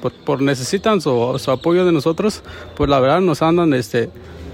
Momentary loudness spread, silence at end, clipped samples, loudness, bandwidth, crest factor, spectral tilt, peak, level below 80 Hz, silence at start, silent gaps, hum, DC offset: 7 LU; 0 s; under 0.1%; -17 LUFS; 16 kHz; 14 dB; -6 dB/octave; -4 dBFS; -40 dBFS; 0 s; none; none; under 0.1%